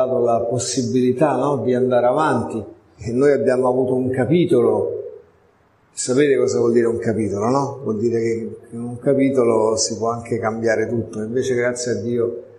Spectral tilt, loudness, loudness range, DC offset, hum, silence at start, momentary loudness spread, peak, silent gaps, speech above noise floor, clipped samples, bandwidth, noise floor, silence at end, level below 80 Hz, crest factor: -5.5 dB/octave; -19 LUFS; 2 LU; under 0.1%; none; 0 s; 10 LU; -4 dBFS; none; 38 dB; under 0.1%; 11.5 kHz; -56 dBFS; 0.15 s; -54 dBFS; 16 dB